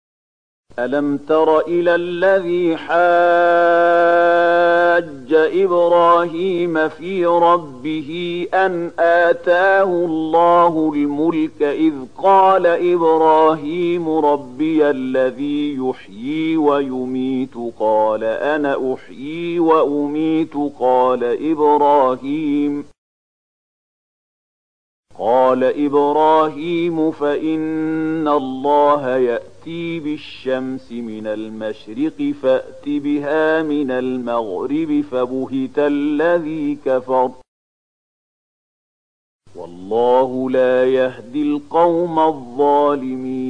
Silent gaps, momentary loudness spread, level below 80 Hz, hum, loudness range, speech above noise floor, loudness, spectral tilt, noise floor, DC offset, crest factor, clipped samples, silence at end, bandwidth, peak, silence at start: 22.98-25.03 s, 37.48-39.39 s; 11 LU; -60 dBFS; none; 8 LU; over 74 dB; -17 LUFS; -7 dB/octave; under -90 dBFS; 0.7%; 14 dB; under 0.1%; 0 s; 9.4 kHz; -2 dBFS; 0.8 s